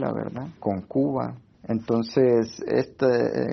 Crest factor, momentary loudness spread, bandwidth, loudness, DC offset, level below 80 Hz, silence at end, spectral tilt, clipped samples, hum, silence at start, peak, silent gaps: 16 dB; 10 LU; 6.4 kHz; -25 LUFS; under 0.1%; -60 dBFS; 0 s; -7.5 dB/octave; under 0.1%; none; 0 s; -8 dBFS; none